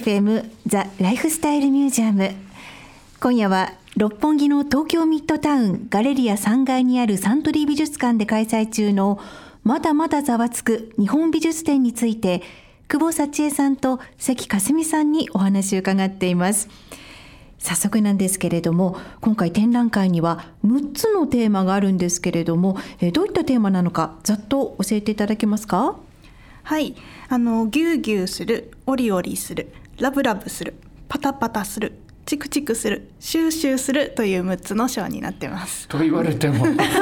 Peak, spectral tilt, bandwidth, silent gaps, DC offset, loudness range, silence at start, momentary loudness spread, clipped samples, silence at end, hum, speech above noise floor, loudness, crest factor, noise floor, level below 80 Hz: -4 dBFS; -5 dB/octave; 19 kHz; none; under 0.1%; 4 LU; 0 s; 9 LU; under 0.1%; 0 s; none; 25 dB; -20 LUFS; 16 dB; -45 dBFS; -50 dBFS